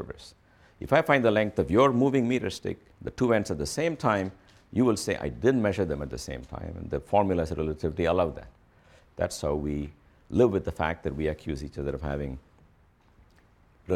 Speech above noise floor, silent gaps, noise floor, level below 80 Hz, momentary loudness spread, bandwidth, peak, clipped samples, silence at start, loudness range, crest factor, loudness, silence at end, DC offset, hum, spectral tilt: 34 dB; none; -61 dBFS; -46 dBFS; 16 LU; 15 kHz; -8 dBFS; under 0.1%; 0 s; 5 LU; 20 dB; -27 LUFS; 0 s; under 0.1%; none; -6 dB/octave